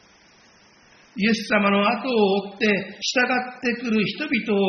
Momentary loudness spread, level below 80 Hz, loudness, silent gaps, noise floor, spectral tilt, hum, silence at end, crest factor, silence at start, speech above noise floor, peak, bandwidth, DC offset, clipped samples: 5 LU; -64 dBFS; -22 LUFS; none; -54 dBFS; -3 dB/octave; none; 0 s; 16 dB; 1.15 s; 32 dB; -6 dBFS; 6.8 kHz; under 0.1%; under 0.1%